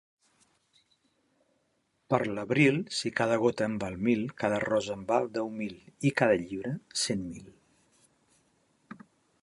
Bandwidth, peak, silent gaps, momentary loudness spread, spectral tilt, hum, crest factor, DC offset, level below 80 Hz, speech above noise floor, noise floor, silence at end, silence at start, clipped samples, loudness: 11.5 kHz; -10 dBFS; none; 14 LU; -5 dB/octave; none; 22 dB; under 0.1%; -64 dBFS; 46 dB; -75 dBFS; 1.9 s; 2.1 s; under 0.1%; -29 LUFS